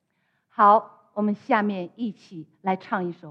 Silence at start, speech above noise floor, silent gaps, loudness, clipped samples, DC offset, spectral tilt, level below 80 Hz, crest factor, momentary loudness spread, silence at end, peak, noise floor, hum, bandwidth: 0.6 s; 49 dB; none; -24 LUFS; under 0.1%; under 0.1%; -8 dB/octave; -82 dBFS; 20 dB; 19 LU; 0 s; -4 dBFS; -72 dBFS; none; 6.4 kHz